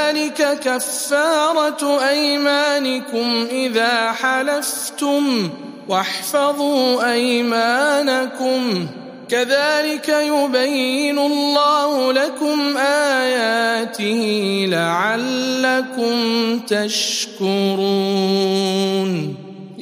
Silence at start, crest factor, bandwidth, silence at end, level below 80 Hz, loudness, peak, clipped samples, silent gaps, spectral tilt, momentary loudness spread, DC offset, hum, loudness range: 0 s; 16 dB; 15.5 kHz; 0 s; -74 dBFS; -18 LUFS; -2 dBFS; under 0.1%; none; -3.5 dB/octave; 5 LU; under 0.1%; none; 2 LU